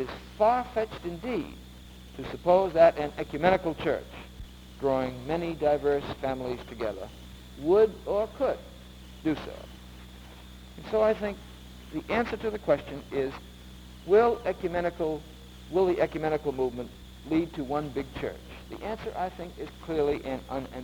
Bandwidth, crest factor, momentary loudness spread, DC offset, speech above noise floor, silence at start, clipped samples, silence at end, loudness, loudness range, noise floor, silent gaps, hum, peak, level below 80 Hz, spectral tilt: over 20 kHz; 22 dB; 23 LU; under 0.1%; 19 dB; 0 s; under 0.1%; 0 s; -29 LUFS; 6 LU; -47 dBFS; none; none; -6 dBFS; -48 dBFS; -6.5 dB/octave